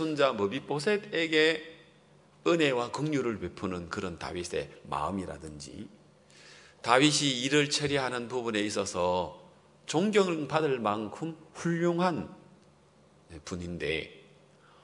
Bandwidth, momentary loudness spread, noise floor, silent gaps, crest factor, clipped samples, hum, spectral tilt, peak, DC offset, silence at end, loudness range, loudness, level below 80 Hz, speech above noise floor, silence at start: 11 kHz; 16 LU; -61 dBFS; none; 24 dB; under 0.1%; none; -4 dB/octave; -6 dBFS; under 0.1%; 0.65 s; 7 LU; -29 LUFS; -64 dBFS; 31 dB; 0 s